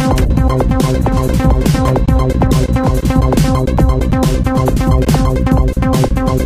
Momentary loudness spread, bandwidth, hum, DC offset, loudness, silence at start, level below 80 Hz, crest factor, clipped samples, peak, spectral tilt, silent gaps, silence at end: 2 LU; 16 kHz; none; under 0.1%; -13 LUFS; 0 s; -16 dBFS; 12 dB; under 0.1%; 0 dBFS; -7 dB/octave; none; 0 s